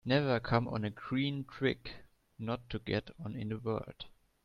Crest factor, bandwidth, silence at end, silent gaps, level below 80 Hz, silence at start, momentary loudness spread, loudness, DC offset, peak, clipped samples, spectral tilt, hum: 24 dB; 6.8 kHz; 0.35 s; none; -58 dBFS; 0.05 s; 17 LU; -36 LUFS; under 0.1%; -12 dBFS; under 0.1%; -8 dB/octave; none